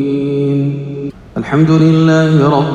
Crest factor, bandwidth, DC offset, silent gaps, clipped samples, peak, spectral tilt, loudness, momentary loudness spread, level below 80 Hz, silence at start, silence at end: 12 dB; 7.6 kHz; under 0.1%; none; under 0.1%; 0 dBFS; -8 dB/octave; -11 LUFS; 14 LU; -44 dBFS; 0 s; 0 s